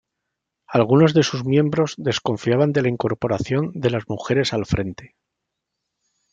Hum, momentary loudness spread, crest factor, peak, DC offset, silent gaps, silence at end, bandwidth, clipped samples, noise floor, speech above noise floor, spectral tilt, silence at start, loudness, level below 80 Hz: none; 8 LU; 18 dB; -2 dBFS; under 0.1%; none; 1.25 s; 7.8 kHz; under 0.1%; -81 dBFS; 61 dB; -6.5 dB/octave; 0.7 s; -20 LUFS; -48 dBFS